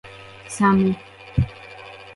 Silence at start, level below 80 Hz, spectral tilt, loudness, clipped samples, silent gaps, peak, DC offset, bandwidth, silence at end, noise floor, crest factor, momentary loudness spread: 0.05 s; -40 dBFS; -7 dB/octave; -22 LUFS; under 0.1%; none; -6 dBFS; under 0.1%; 11.5 kHz; 0.05 s; -40 dBFS; 18 dB; 22 LU